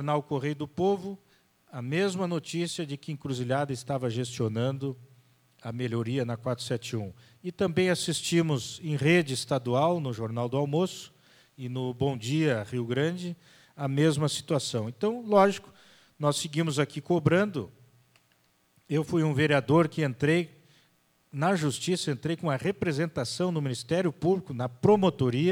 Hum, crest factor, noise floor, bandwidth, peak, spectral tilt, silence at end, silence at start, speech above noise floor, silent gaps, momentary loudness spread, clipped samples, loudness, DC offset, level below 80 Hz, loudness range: none; 20 dB; -68 dBFS; 16.5 kHz; -8 dBFS; -5.5 dB/octave; 0 s; 0 s; 40 dB; none; 13 LU; under 0.1%; -28 LUFS; under 0.1%; -64 dBFS; 5 LU